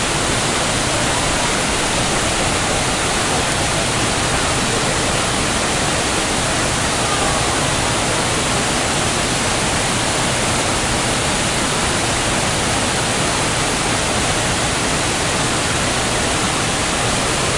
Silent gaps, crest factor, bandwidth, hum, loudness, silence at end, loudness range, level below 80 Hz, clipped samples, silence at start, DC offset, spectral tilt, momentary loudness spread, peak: none; 14 dB; 11.5 kHz; none; -16 LUFS; 0 s; 0 LU; -32 dBFS; under 0.1%; 0 s; under 0.1%; -2.5 dB/octave; 0 LU; -4 dBFS